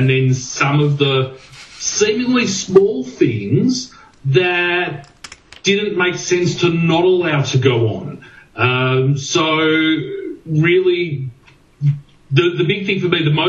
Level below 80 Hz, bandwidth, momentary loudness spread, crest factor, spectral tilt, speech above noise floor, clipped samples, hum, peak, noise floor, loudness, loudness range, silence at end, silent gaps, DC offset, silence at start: -54 dBFS; 8.2 kHz; 13 LU; 16 dB; -5 dB/octave; 32 dB; under 0.1%; none; 0 dBFS; -47 dBFS; -16 LUFS; 2 LU; 0 s; none; under 0.1%; 0 s